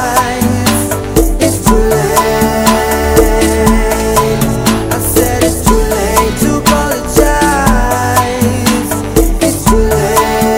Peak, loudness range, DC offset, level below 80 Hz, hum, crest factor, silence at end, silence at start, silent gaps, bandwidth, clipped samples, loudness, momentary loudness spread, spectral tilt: 0 dBFS; 1 LU; under 0.1%; -18 dBFS; none; 10 dB; 0 s; 0 s; none; over 20 kHz; 0.8%; -11 LUFS; 3 LU; -4.5 dB/octave